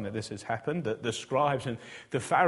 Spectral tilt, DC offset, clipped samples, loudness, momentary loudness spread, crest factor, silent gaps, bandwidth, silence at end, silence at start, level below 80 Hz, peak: -5 dB/octave; under 0.1%; under 0.1%; -32 LUFS; 9 LU; 20 dB; none; 11.5 kHz; 0 s; 0 s; -64 dBFS; -10 dBFS